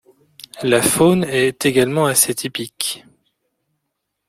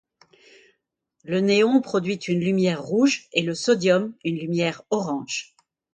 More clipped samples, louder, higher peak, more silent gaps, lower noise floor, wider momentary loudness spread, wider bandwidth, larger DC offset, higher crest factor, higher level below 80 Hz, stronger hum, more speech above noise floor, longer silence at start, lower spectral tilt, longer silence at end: neither; first, -16 LUFS vs -23 LUFS; first, 0 dBFS vs -6 dBFS; neither; about the same, -76 dBFS vs -75 dBFS; about the same, 10 LU vs 9 LU; first, 16.5 kHz vs 9.4 kHz; neither; about the same, 18 dB vs 18 dB; first, -54 dBFS vs -68 dBFS; neither; first, 59 dB vs 53 dB; second, 0.55 s vs 1.25 s; second, -3.5 dB/octave vs -5 dB/octave; first, 1.3 s vs 0.5 s